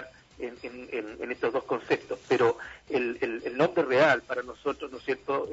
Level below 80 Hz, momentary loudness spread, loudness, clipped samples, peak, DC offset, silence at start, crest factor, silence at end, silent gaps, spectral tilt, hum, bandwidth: -64 dBFS; 15 LU; -29 LUFS; under 0.1%; -10 dBFS; under 0.1%; 0 s; 20 dB; 0 s; none; -5.5 dB/octave; none; 8 kHz